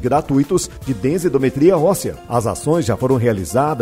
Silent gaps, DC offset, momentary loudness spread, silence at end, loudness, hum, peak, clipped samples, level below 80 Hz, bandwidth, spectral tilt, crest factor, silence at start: none; under 0.1%; 7 LU; 0 s; -17 LUFS; none; -2 dBFS; under 0.1%; -42 dBFS; 16 kHz; -6.5 dB/octave; 16 dB; 0 s